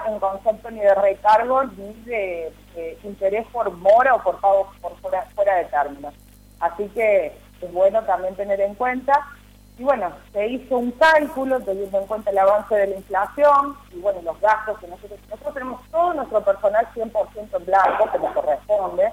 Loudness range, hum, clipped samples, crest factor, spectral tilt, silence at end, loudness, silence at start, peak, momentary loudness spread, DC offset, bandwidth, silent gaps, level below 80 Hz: 3 LU; 50 Hz at -50 dBFS; under 0.1%; 14 dB; -5 dB/octave; 0 s; -20 LUFS; 0 s; -6 dBFS; 15 LU; under 0.1%; 15.5 kHz; none; -50 dBFS